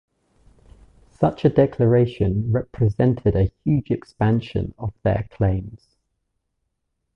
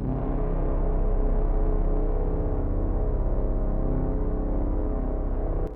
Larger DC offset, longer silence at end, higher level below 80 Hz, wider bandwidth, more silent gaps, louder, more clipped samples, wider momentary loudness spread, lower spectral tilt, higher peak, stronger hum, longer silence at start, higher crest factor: neither; first, 1.4 s vs 0 s; second, -38 dBFS vs -24 dBFS; first, 5.8 kHz vs 2.4 kHz; neither; first, -21 LUFS vs -29 LUFS; neither; first, 9 LU vs 2 LU; second, -10 dB/octave vs -12.5 dB/octave; first, -4 dBFS vs -14 dBFS; neither; first, 1.2 s vs 0 s; first, 18 dB vs 10 dB